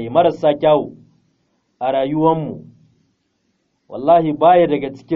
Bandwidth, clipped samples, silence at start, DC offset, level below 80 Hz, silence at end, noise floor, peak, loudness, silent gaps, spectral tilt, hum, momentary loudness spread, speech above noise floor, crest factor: 5.8 kHz; under 0.1%; 0 s; under 0.1%; -54 dBFS; 0 s; -67 dBFS; -2 dBFS; -16 LUFS; none; -5.5 dB/octave; none; 16 LU; 52 dB; 16 dB